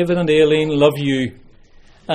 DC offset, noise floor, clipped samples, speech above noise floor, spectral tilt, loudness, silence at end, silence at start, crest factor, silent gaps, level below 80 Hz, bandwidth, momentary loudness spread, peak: under 0.1%; -45 dBFS; under 0.1%; 30 dB; -6.5 dB/octave; -16 LUFS; 0 s; 0 s; 16 dB; none; -46 dBFS; 15.5 kHz; 8 LU; 0 dBFS